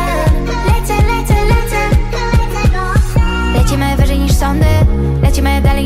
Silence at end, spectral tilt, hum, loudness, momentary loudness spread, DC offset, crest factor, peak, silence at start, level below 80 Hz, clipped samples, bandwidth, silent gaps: 0 s; -6 dB/octave; none; -13 LUFS; 3 LU; under 0.1%; 8 dB; -2 dBFS; 0 s; -14 dBFS; under 0.1%; 16 kHz; none